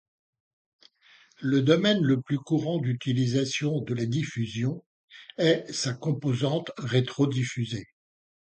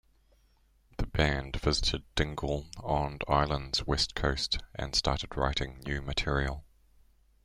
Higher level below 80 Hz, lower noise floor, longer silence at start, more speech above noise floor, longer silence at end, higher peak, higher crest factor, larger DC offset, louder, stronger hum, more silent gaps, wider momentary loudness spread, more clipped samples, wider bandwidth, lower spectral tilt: second, -64 dBFS vs -40 dBFS; second, -59 dBFS vs -66 dBFS; first, 1.4 s vs 1 s; about the same, 33 dB vs 35 dB; second, 0.55 s vs 0.85 s; first, -6 dBFS vs -10 dBFS; about the same, 20 dB vs 22 dB; neither; first, -27 LUFS vs -31 LUFS; neither; first, 4.86-5.08 s vs none; first, 10 LU vs 7 LU; neither; second, 9 kHz vs 12.5 kHz; first, -6 dB/octave vs -4.5 dB/octave